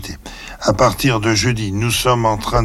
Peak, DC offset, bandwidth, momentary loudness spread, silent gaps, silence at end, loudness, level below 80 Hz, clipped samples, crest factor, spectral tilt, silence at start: -4 dBFS; under 0.1%; 16 kHz; 14 LU; none; 0 s; -16 LUFS; -34 dBFS; under 0.1%; 12 dB; -4.5 dB/octave; 0 s